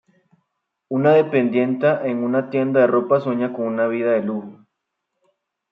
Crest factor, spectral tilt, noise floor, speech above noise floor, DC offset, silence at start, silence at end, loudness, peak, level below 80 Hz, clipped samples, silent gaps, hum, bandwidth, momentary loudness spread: 16 dB; -9.5 dB/octave; -78 dBFS; 59 dB; under 0.1%; 0.9 s; 1.2 s; -19 LUFS; -4 dBFS; -72 dBFS; under 0.1%; none; none; 5.4 kHz; 7 LU